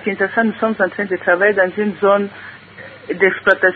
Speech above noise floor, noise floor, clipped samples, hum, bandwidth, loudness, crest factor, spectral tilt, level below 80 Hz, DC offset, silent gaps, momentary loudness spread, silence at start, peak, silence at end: 21 dB; -37 dBFS; under 0.1%; none; 4.8 kHz; -16 LUFS; 16 dB; -8 dB/octave; -60 dBFS; under 0.1%; none; 21 LU; 0 s; 0 dBFS; 0 s